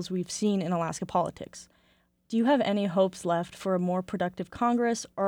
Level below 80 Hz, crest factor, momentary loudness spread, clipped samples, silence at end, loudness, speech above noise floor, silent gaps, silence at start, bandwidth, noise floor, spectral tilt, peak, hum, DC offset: -64 dBFS; 16 dB; 8 LU; under 0.1%; 0 s; -28 LUFS; 39 dB; none; 0 s; 16.5 kHz; -67 dBFS; -5.5 dB/octave; -14 dBFS; none; under 0.1%